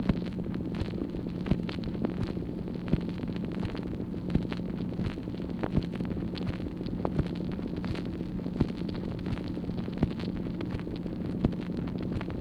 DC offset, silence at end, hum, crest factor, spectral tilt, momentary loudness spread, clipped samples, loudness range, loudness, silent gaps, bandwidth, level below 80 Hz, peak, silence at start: under 0.1%; 0 s; none; 22 dB; -8.5 dB/octave; 4 LU; under 0.1%; 1 LU; -34 LUFS; none; 9.2 kHz; -44 dBFS; -10 dBFS; 0 s